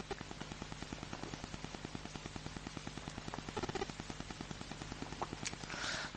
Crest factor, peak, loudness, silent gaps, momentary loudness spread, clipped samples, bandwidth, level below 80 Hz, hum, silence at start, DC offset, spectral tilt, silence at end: 22 dB; -22 dBFS; -45 LUFS; none; 5 LU; under 0.1%; 10 kHz; -56 dBFS; none; 0 s; under 0.1%; -3.5 dB/octave; 0 s